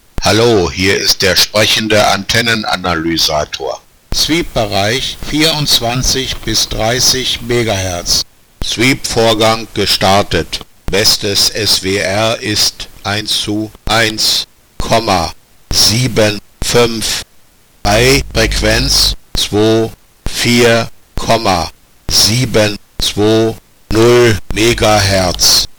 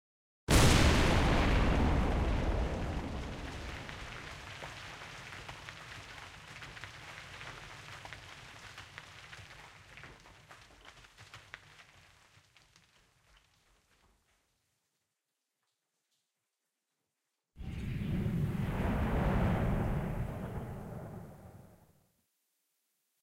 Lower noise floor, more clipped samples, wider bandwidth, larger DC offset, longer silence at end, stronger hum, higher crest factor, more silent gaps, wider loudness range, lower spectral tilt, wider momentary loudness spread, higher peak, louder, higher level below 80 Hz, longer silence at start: second, -46 dBFS vs -87 dBFS; neither; first, over 20 kHz vs 16 kHz; neither; second, 0.05 s vs 1.55 s; neither; second, 12 dB vs 22 dB; neither; second, 2 LU vs 23 LU; second, -3 dB/octave vs -5 dB/octave; second, 10 LU vs 23 LU; first, 0 dBFS vs -14 dBFS; first, -11 LUFS vs -33 LUFS; first, -28 dBFS vs -40 dBFS; second, 0.2 s vs 0.5 s